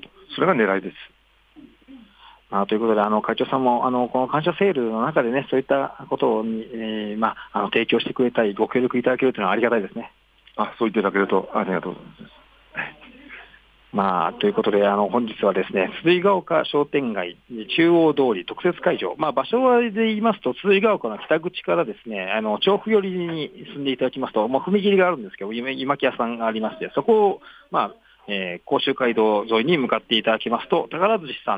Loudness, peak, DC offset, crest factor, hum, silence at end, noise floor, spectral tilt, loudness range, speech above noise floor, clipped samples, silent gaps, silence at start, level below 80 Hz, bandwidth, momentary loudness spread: -21 LUFS; -6 dBFS; under 0.1%; 16 dB; none; 0 s; -51 dBFS; -8 dB/octave; 4 LU; 30 dB; under 0.1%; none; 0.3 s; -62 dBFS; 5 kHz; 10 LU